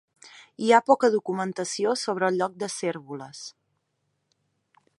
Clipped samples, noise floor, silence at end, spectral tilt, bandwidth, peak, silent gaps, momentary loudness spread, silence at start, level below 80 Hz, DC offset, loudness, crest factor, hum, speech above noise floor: under 0.1%; -76 dBFS; 1.5 s; -4 dB/octave; 11.5 kHz; -4 dBFS; none; 19 LU; 0.25 s; -80 dBFS; under 0.1%; -24 LUFS; 24 dB; none; 51 dB